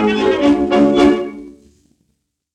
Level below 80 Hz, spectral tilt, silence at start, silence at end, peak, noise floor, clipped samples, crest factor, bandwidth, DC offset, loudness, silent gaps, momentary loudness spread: -42 dBFS; -6 dB/octave; 0 s; 1.05 s; 0 dBFS; -68 dBFS; under 0.1%; 16 dB; 9.4 kHz; under 0.1%; -13 LUFS; none; 14 LU